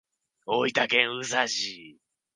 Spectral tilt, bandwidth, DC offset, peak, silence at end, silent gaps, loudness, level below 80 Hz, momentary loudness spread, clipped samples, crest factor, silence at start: -2 dB/octave; 10.5 kHz; under 0.1%; -4 dBFS; 0.45 s; none; -25 LUFS; -78 dBFS; 15 LU; under 0.1%; 26 dB; 0.45 s